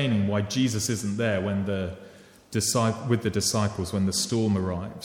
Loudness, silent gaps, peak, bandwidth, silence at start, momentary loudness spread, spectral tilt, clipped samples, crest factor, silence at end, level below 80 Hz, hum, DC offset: -26 LUFS; none; -10 dBFS; 17.5 kHz; 0 s; 6 LU; -4.5 dB/octave; under 0.1%; 16 dB; 0 s; -54 dBFS; none; under 0.1%